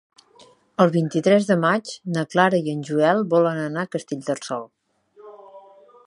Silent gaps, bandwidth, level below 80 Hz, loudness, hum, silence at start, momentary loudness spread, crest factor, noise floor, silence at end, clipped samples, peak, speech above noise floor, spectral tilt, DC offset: none; 11.5 kHz; -72 dBFS; -21 LUFS; none; 0.8 s; 10 LU; 20 dB; -53 dBFS; 0.45 s; under 0.1%; -2 dBFS; 33 dB; -6 dB/octave; under 0.1%